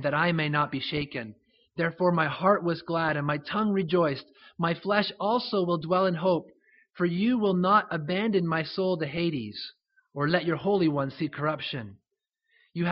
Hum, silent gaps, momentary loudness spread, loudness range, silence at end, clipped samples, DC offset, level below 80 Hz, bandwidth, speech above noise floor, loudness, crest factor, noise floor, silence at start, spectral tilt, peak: none; none; 11 LU; 3 LU; 0 s; under 0.1%; under 0.1%; -64 dBFS; 5.8 kHz; 55 dB; -27 LUFS; 20 dB; -82 dBFS; 0 s; -4.5 dB/octave; -8 dBFS